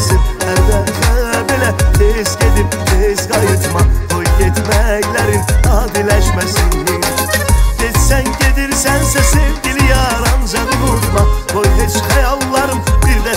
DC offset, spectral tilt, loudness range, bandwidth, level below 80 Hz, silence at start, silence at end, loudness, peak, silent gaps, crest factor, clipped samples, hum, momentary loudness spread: under 0.1%; -4.5 dB/octave; 1 LU; 16.5 kHz; -14 dBFS; 0 s; 0 s; -13 LUFS; 0 dBFS; none; 12 dB; under 0.1%; none; 2 LU